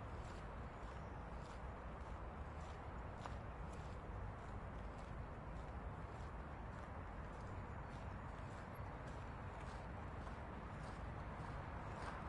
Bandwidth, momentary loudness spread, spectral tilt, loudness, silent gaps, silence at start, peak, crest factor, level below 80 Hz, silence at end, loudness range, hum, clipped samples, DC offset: 11 kHz; 2 LU; -7 dB/octave; -52 LUFS; none; 0 s; -32 dBFS; 18 dB; -54 dBFS; 0 s; 1 LU; none; under 0.1%; under 0.1%